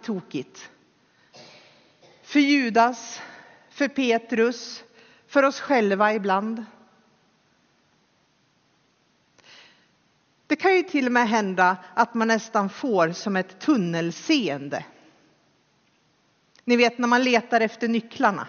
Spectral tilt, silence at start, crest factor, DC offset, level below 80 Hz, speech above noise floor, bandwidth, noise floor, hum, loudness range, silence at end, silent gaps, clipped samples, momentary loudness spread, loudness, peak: -3 dB/octave; 0.05 s; 20 dB; under 0.1%; -76 dBFS; 43 dB; 7 kHz; -65 dBFS; none; 5 LU; 0 s; none; under 0.1%; 15 LU; -23 LUFS; -6 dBFS